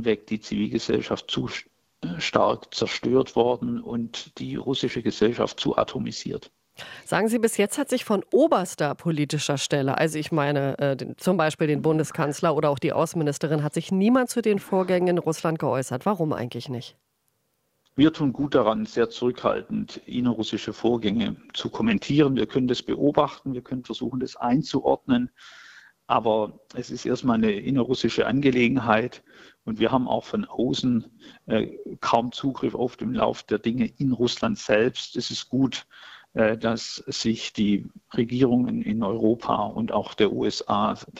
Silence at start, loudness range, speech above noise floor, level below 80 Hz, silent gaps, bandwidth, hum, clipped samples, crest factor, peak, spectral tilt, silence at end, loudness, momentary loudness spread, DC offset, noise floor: 0 s; 3 LU; 48 dB; -56 dBFS; none; 15.5 kHz; none; under 0.1%; 22 dB; -4 dBFS; -5.5 dB/octave; 0 s; -25 LUFS; 10 LU; under 0.1%; -73 dBFS